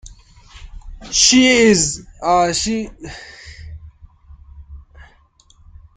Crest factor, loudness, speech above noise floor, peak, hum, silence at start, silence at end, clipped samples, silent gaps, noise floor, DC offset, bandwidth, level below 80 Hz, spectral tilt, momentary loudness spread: 20 dB; -14 LUFS; 37 dB; 0 dBFS; none; 0.05 s; 1.2 s; under 0.1%; none; -52 dBFS; under 0.1%; 10 kHz; -40 dBFS; -2.5 dB/octave; 26 LU